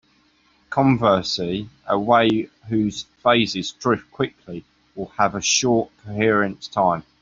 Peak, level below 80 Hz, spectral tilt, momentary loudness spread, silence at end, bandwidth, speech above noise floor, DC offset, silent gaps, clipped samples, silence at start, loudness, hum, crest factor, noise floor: -2 dBFS; -54 dBFS; -4 dB/octave; 13 LU; 0.2 s; 7.8 kHz; 39 dB; under 0.1%; none; under 0.1%; 0.7 s; -21 LUFS; none; 18 dB; -60 dBFS